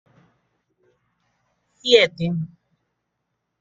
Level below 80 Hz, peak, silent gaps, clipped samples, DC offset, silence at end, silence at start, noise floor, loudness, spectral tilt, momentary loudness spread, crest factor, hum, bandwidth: -64 dBFS; -2 dBFS; none; under 0.1%; under 0.1%; 1.15 s; 1.85 s; -77 dBFS; -19 LUFS; -4.5 dB/octave; 14 LU; 24 dB; none; 7.8 kHz